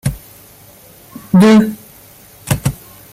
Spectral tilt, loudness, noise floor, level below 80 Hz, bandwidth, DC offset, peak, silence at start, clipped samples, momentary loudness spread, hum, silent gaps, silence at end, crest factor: -6.5 dB/octave; -13 LUFS; -41 dBFS; -38 dBFS; 16.5 kHz; under 0.1%; -2 dBFS; 0.05 s; under 0.1%; 26 LU; none; none; 0.4 s; 14 dB